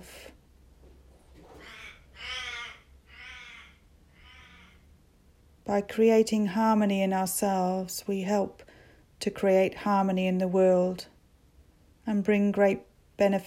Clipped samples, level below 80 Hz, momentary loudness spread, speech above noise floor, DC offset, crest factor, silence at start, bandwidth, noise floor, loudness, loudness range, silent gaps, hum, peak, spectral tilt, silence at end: under 0.1%; -60 dBFS; 22 LU; 35 dB; under 0.1%; 18 dB; 0 s; 16 kHz; -60 dBFS; -27 LUFS; 15 LU; none; none; -12 dBFS; -5.5 dB/octave; 0 s